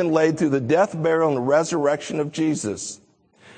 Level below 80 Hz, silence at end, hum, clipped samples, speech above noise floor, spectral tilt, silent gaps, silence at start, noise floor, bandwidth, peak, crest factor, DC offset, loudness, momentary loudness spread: -64 dBFS; 0.05 s; none; under 0.1%; 32 dB; -5.5 dB/octave; none; 0 s; -53 dBFS; 9.4 kHz; -4 dBFS; 18 dB; under 0.1%; -21 LUFS; 9 LU